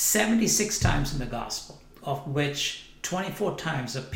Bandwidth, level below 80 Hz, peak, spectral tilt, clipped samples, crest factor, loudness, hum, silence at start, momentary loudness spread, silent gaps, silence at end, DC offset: 16.5 kHz; -40 dBFS; -10 dBFS; -3.5 dB/octave; under 0.1%; 18 dB; -27 LUFS; none; 0 s; 12 LU; none; 0 s; under 0.1%